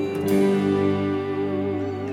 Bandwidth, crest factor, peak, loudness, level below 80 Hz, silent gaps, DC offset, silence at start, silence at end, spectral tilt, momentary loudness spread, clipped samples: 16 kHz; 12 dB; -10 dBFS; -23 LUFS; -64 dBFS; none; under 0.1%; 0 s; 0 s; -7.5 dB/octave; 6 LU; under 0.1%